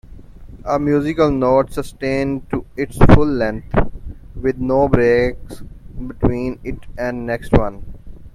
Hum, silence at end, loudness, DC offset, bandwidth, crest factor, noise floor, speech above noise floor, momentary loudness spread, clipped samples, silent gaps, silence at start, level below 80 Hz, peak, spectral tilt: none; 0.05 s; -18 LUFS; under 0.1%; 13 kHz; 16 dB; -36 dBFS; 21 dB; 19 LU; under 0.1%; none; 0.05 s; -26 dBFS; 0 dBFS; -8 dB/octave